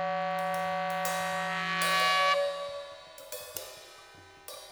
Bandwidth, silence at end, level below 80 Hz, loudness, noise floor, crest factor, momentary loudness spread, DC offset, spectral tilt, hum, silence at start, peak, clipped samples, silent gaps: over 20 kHz; 0 s; -72 dBFS; -29 LUFS; -53 dBFS; 20 dB; 22 LU; under 0.1%; -2 dB/octave; none; 0 s; -12 dBFS; under 0.1%; none